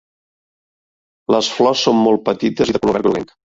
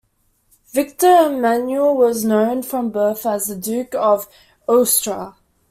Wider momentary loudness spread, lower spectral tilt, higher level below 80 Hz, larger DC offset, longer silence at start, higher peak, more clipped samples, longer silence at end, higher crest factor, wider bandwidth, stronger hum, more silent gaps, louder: second, 5 LU vs 11 LU; first, -5 dB/octave vs -3.5 dB/octave; first, -50 dBFS vs -60 dBFS; neither; first, 1.3 s vs 0.75 s; about the same, -2 dBFS vs -2 dBFS; neither; about the same, 0.35 s vs 0.4 s; about the same, 16 dB vs 16 dB; second, 7.8 kHz vs 16 kHz; neither; neither; about the same, -16 LUFS vs -17 LUFS